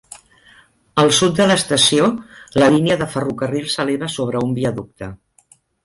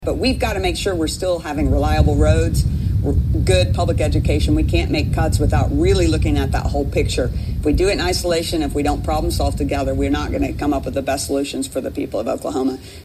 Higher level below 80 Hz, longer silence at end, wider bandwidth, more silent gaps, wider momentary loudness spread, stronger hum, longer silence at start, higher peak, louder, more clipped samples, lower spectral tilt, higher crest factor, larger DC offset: second, -50 dBFS vs -24 dBFS; first, 0.7 s vs 0 s; second, 12 kHz vs 15 kHz; neither; first, 13 LU vs 6 LU; neither; about the same, 0.1 s vs 0 s; about the same, -2 dBFS vs 0 dBFS; first, -16 LUFS vs -19 LUFS; neither; second, -4 dB/octave vs -6 dB/octave; about the same, 16 dB vs 16 dB; neither